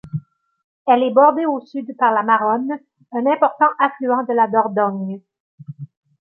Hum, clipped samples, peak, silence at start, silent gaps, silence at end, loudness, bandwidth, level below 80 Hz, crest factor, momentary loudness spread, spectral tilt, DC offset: none; under 0.1%; -2 dBFS; 0.05 s; 0.64-0.85 s, 5.40-5.58 s; 0.35 s; -17 LUFS; 4.4 kHz; -68 dBFS; 16 dB; 16 LU; -9.5 dB/octave; under 0.1%